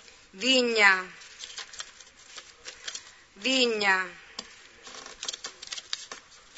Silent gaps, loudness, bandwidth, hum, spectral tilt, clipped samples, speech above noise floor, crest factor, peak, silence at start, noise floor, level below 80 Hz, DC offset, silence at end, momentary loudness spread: none; -25 LUFS; 8.2 kHz; none; -1 dB/octave; under 0.1%; 27 dB; 24 dB; -6 dBFS; 0.35 s; -51 dBFS; -70 dBFS; under 0.1%; 0.4 s; 24 LU